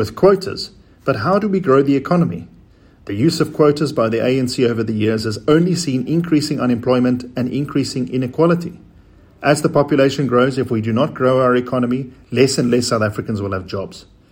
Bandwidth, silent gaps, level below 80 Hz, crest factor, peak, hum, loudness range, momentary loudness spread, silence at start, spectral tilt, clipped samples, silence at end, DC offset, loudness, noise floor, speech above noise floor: 16.5 kHz; none; -50 dBFS; 16 dB; 0 dBFS; none; 2 LU; 9 LU; 0 s; -6 dB/octave; under 0.1%; 0.3 s; under 0.1%; -17 LUFS; -47 dBFS; 31 dB